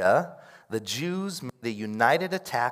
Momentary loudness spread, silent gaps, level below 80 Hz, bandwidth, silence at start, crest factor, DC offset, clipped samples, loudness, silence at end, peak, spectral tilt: 11 LU; none; -76 dBFS; 16 kHz; 0 s; 22 dB; under 0.1%; under 0.1%; -28 LUFS; 0 s; -6 dBFS; -4.5 dB/octave